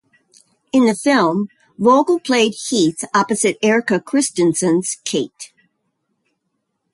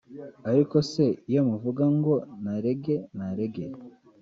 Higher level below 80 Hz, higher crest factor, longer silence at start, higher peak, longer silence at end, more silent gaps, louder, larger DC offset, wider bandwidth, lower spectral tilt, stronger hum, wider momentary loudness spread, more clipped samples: about the same, -64 dBFS vs -64 dBFS; about the same, 16 dB vs 16 dB; first, 0.75 s vs 0.1 s; first, -2 dBFS vs -10 dBFS; first, 1.5 s vs 0.35 s; neither; first, -17 LUFS vs -26 LUFS; neither; first, 11.5 kHz vs 7.6 kHz; second, -4 dB/octave vs -8.5 dB/octave; neither; second, 8 LU vs 14 LU; neither